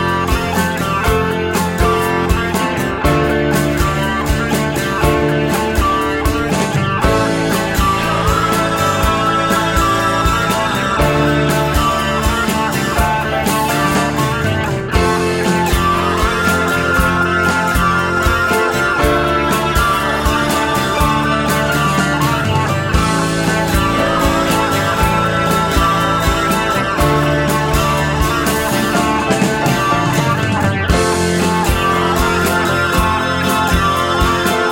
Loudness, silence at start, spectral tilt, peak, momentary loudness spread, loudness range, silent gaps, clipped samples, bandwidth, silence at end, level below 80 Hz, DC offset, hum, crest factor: -14 LUFS; 0 s; -5 dB/octave; -2 dBFS; 2 LU; 1 LU; none; under 0.1%; 17 kHz; 0 s; -24 dBFS; under 0.1%; none; 14 dB